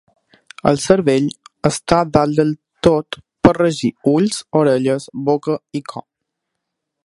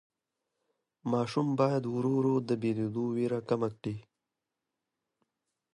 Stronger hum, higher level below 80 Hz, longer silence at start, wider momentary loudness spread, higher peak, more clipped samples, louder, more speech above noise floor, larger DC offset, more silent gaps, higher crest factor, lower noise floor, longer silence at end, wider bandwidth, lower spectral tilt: neither; first, -44 dBFS vs -72 dBFS; second, 0.65 s vs 1.05 s; about the same, 10 LU vs 10 LU; first, 0 dBFS vs -14 dBFS; neither; first, -17 LUFS vs -31 LUFS; about the same, 61 dB vs 58 dB; neither; neither; about the same, 18 dB vs 20 dB; second, -78 dBFS vs -88 dBFS; second, 1.05 s vs 1.75 s; about the same, 11.5 kHz vs 11.5 kHz; second, -6 dB/octave vs -8 dB/octave